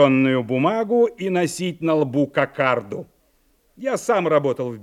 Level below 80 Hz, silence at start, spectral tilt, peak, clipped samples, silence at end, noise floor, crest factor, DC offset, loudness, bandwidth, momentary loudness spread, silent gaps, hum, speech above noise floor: -64 dBFS; 0 s; -6 dB/octave; -4 dBFS; under 0.1%; 0 s; -62 dBFS; 18 dB; under 0.1%; -21 LUFS; 14 kHz; 7 LU; none; none; 42 dB